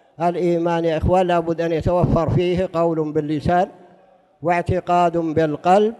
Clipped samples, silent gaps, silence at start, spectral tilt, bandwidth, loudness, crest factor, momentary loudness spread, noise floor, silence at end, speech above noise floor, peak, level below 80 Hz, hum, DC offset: under 0.1%; none; 0.2 s; -8 dB/octave; 11.5 kHz; -19 LUFS; 14 dB; 4 LU; -53 dBFS; 0.05 s; 34 dB; -4 dBFS; -38 dBFS; none; under 0.1%